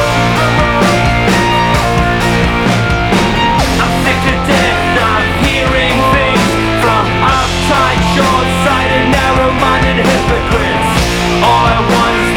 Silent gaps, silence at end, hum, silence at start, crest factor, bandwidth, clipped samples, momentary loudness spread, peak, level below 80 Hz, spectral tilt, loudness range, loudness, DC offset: none; 0 s; none; 0 s; 10 dB; 19 kHz; under 0.1%; 2 LU; 0 dBFS; -22 dBFS; -5 dB/octave; 0 LU; -10 LUFS; under 0.1%